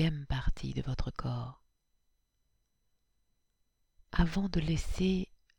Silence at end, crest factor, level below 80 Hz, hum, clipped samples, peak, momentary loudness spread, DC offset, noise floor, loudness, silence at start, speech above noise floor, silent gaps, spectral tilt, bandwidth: 0.35 s; 22 dB; -42 dBFS; none; under 0.1%; -12 dBFS; 7 LU; under 0.1%; -77 dBFS; -35 LUFS; 0 s; 45 dB; none; -6.5 dB/octave; 16.5 kHz